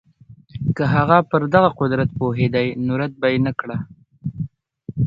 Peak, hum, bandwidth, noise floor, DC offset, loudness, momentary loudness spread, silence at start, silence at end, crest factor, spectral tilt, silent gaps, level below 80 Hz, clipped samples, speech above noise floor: 0 dBFS; none; 7.2 kHz; -47 dBFS; under 0.1%; -19 LUFS; 17 LU; 0.3 s; 0 s; 20 dB; -9.5 dB/octave; none; -46 dBFS; under 0.1%; 29 dB